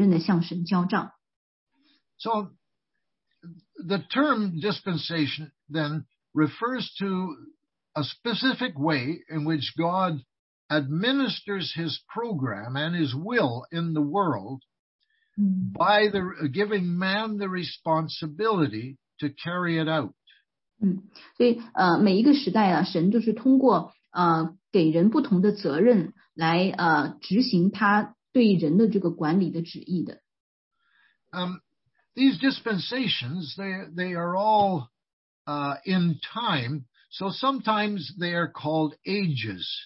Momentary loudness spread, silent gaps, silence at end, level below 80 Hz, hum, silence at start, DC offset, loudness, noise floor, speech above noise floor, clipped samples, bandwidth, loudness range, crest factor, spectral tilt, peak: 12 LU; 1.36-1.67 s, 10.39-10.69 s, 14.79-14.99 s, 30.40-30.71 s, 35.13-35.45 s; 0 s; -70 dBFS; none; 0 s; under 0.1%; -25 LUFS; -83 dBFS; 58 dB; under 0.1%; 5.8 kHz; 7 LU; 18 dB; -10 dB/octave; -8 dBFS